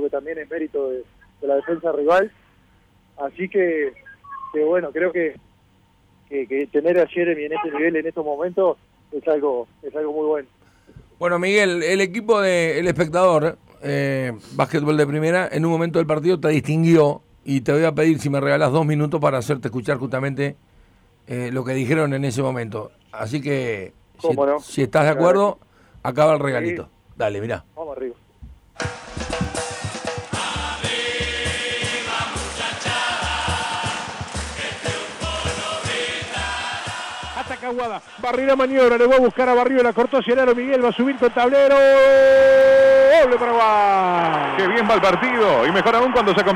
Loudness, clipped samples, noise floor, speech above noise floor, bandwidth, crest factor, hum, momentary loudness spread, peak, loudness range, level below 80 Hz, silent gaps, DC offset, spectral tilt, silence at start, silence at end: -19 LUFS; under 0.1%; -57 dBFS; 39 dB; 13 kHz; 14 dB; none; 14 LU; -6 dBFS; 11 LU; -46 dBFS; none; under 0.1%; -5.5 dB/octave; 0 s; 0 s